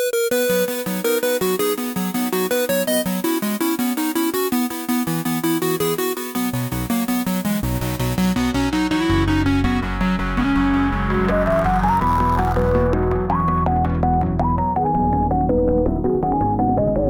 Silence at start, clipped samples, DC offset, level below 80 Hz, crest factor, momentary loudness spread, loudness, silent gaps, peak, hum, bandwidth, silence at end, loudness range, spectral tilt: 0 s; under 0.1%; under 0.1%; -30 dBFS; 14 dB; 4 LU; -20 LUFS; none; -6 dBFS; none; 19.5 kHz; 0 s; 3 LU; -5.5 dB/octave